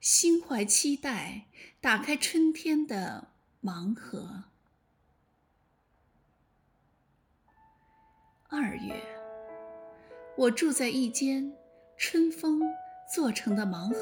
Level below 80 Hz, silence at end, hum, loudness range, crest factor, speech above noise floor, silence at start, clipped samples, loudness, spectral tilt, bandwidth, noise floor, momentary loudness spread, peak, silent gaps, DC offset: -70 dBFS; 0 s; none; 13 LU; 22 dB; 42 dB; 0 s; under 0.1%; -29 LUFS; -2.5 dB/octave; over 20 kHz; -71 dBFS; 20 LU; -10 dBFS; none; under 0.1%